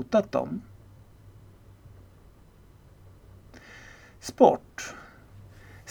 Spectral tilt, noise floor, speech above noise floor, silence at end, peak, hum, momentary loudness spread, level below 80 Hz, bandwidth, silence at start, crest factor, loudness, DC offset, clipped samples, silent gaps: -5.5 dB/octave; -54 dBFS; 29 dB; 0 s; -4 dBFS; none; 29 LU; -58 dBFS; 19 kHz; 0 s; 26 dB; -26 LUFS; under 0.1%; under 0.1%; none